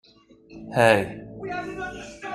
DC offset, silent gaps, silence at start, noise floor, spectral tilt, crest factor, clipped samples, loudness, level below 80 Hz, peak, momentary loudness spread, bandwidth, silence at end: under 0.1%; none; 0.5 s; -53 dBFS; -5.5 dB/octave; 22 dB; under 0.1%; -24 LUFS; -54 dBFS; -4 dBFS; 18 LU; 15.5 kHz; 0 s